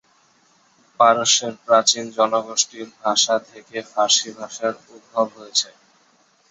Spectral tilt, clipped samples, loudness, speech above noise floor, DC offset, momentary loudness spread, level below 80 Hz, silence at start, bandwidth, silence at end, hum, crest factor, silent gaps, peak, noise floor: -0.5 dB/octave; under 0.1%; -19 LUFS; 38 dB; under 0.1%; 13 LU; -72 dBFS; 1 s; 8.4 kHz; 0.85 s; none; 20 dB; none; -2 dBFS; -59 dBFS